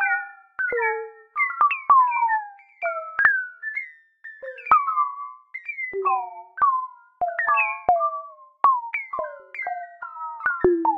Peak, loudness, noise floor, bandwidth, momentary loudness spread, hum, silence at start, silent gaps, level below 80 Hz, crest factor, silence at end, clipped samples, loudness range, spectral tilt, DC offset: -2 dBFS; -23 LUFS; -45 dBFS; 5 kHz; 17 LU; none; 0 s; none; -58 dBFS; 22 dB; 0 s; under 0.1%; 3 LU; -7.5 dB/octave; under 0.1%